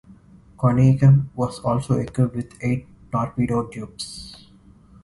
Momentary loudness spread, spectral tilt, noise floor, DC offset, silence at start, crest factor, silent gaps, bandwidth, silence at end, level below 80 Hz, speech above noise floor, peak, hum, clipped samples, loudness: 17 LU; -8 dB/octave; -50 dBFS; under 0.1%; 0.6 s; 18 dB; none; 11.5 kHz; 0.7 s; -46 dBFS; 30 dB; -4 dBFS; none; under 0.1%; -21 LUFS